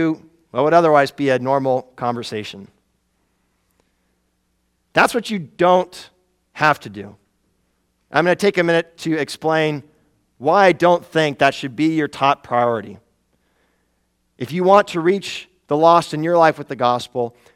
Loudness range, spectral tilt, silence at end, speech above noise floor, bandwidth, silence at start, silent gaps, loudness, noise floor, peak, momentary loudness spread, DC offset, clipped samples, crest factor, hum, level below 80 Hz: 6 LU; -5.5 dB/octave; 0.25 s; 50 dB; 15 kHz; 0 s; none; -18 LUFS; -67 dBFS; 0 dBFS; 15 LU; under 0.1%; under 0.1%; 20 dB; none; -62 dBFS